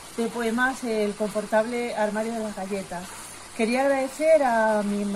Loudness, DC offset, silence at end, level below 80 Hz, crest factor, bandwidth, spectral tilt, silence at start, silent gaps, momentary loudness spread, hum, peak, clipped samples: -25 LUFS; under 0.1%; 0 s; -56 dBFS; 16 dB; 15 kHz; -4.5 dB/octave; 0 s; none; 12 LU; none; -10 dBFS; under 0.1%